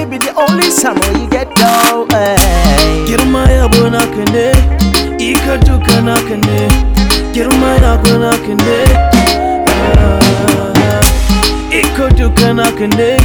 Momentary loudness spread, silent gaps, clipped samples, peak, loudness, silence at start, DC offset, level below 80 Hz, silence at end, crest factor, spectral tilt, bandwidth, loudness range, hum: 4 LU; none; 0.9%; 0 dBFS; -10 LUFS; 0 s; under 0.1%; -14 dBFS; 0 s; 8 dB; -4.5 dB/octave; over 20 kHz; 1 LU; none